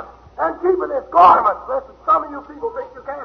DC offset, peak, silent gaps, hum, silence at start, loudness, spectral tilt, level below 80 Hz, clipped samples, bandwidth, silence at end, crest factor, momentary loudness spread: under 0.1%; -2 dBFS; none; none; 0 s; -16 LUFS; -6.5 dB/octave; -50 dBFS; under 0.1%; 6.4 kHz; 0 s; 16 dB; 19 LU